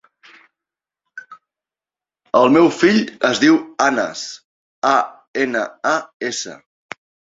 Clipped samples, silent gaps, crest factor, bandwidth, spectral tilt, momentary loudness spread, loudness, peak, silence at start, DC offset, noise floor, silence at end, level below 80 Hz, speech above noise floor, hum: under 0.1%; 4.45-4.82 s, 5.27-5.34 s, 6.14-6.20 s; 18 dB; 7.8 kHz; -4 dB/octave; 24 LU; -17 LUFS; 0 dBFS; 1.15 s; under 0.1%; under -90 dBFS; 0.85 s; -62 dBFS; over 74 dB; none